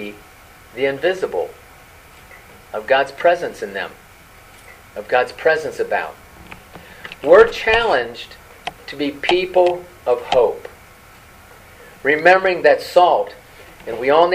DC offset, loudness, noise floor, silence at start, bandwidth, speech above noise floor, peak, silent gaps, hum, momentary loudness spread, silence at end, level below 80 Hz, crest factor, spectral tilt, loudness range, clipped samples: under 0.1%; -17 LUFS; -44 dBFS; 0 s; 15.5 kHz; 28 dB; 0 dBFS; none; none; 22 LU; 0 s; -48 dBFS; 18 dB; -4.5 dB/octave; 6 LU; under 0.1%